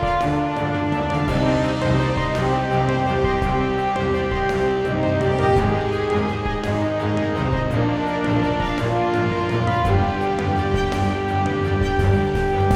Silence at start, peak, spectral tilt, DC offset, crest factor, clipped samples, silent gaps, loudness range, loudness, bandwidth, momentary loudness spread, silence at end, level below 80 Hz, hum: 0 s; -6 dBFS; -7 dB/octave; under 0.1%; 14 dB; under 0.1%; none; 1 LU; -21 LUFS; 11.5 kHz; 3 LU; 0 s; -34 dBFS; none